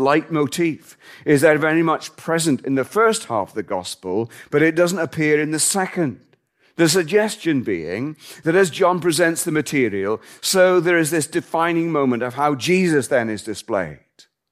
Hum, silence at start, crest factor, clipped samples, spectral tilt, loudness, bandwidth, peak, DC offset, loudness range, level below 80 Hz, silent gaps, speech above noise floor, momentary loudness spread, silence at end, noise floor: none; 0 s; 18 dB; under 0.1%; -4.5 dB/octave; -19 LUFS; 16 kHz; -2 dBFS; under 0.1%; 2 LU; -64 dBFS; none; 40 dB; 10 LU; 0.55 s; -59 dBFS